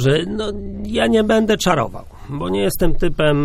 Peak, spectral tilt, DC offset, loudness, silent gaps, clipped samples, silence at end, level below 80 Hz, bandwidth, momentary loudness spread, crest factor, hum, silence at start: 0 dBFS; -5.5 dB/octave; under 0.1%; -18 LUFS; none; under 0.1%; 0 s; -28 dBFS; 15.5 kHz; 12 LU; 16 dB; none; 0 s